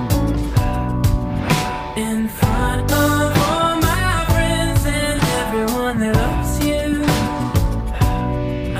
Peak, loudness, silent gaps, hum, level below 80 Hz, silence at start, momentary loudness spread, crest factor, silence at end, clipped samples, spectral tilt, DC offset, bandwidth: -4 dBFS; -18 LUFS; none; none; -24 dBFS; 0 s; 5 LU; 14 dB; 0 s; under 0.1%; -5.5 dB/octave; under 0.1%; 16 kHz